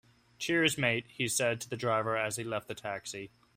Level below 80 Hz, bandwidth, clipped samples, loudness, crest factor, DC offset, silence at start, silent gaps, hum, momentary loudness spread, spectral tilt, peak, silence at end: -68 dBFS; 16 kHz; under 0.1%; -32 LUFS; 22 dB; under 0.1%; 0.4 s; none; none; 11 LU; -3.5 dB/octave; -12 dBFS; 0.3 s